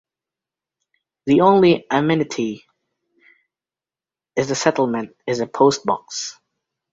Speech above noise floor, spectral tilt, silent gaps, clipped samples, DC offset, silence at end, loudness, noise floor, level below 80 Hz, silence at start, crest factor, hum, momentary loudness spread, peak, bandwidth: over 72 dB; -5 dB/octave; none; under 0.1%; under 0.1%; 0.6 s; -19 LUFS; under -90 dBFS; -60 dBFS; 1.25 s; 20 dB; none; 14 LU; -2 dBFS; 8 kHz